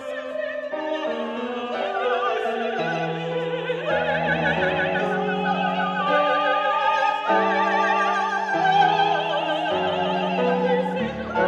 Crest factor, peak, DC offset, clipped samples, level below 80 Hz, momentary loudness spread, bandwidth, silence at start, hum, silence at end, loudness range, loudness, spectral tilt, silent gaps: 16 dB; -6 dBFS; under 0.1%; under 0.1%; -56 dBFS; 7 LU; 9.8 kHz; 0 s; none; 0 s; 5 LU; -22 LUFS; -5.5 dB/octave; none